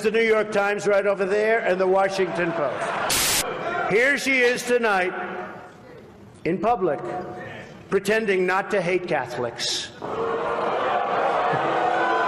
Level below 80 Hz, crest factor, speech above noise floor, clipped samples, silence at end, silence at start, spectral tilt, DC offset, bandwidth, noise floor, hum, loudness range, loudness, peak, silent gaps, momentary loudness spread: -56 dBFS; 14 dB; 23 dB; under 0.1%; 0 s; 0 s; -3 dB/octave; under 0.1%; 15.5 kHz; -45 dBFS; none; 5 LU; -22 LUFS; -10 dBFS; none; 12 LU